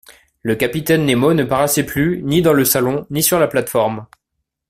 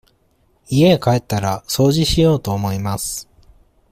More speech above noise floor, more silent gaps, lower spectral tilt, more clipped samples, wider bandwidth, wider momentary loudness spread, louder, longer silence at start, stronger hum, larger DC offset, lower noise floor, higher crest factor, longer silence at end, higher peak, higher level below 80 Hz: first, 60 dB vs 43 dB; neither; about the same, -4.5 dB/octave vs -5.5 dB/octave; neither; about the same, 16 kHz vs 16 kHz; second, 6 LU vs 9 LU; about the same, -16 LUFS vs -17 LUFS; second, 0.1 s vs 0.7 s; neither; neither; first, -76 dBFS vs -59 dBFS; about the same, 16 dB vs 14 dB; about the same, 0.65 s vs 0.7 s; about the same, -2 dBFS vs -2 dBFS; second, -46 dBFS vs -36 dBFS